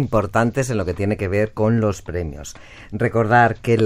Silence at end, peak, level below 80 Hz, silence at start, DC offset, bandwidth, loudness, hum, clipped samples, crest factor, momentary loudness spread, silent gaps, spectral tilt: 0 s; -2 dBFS; -40 dBFS; 0 s; under 0.1%; 15.5 kHz; -19 LUFS; none; under 0.1%; 16 dB; 14 LU; none; -7 dB/octave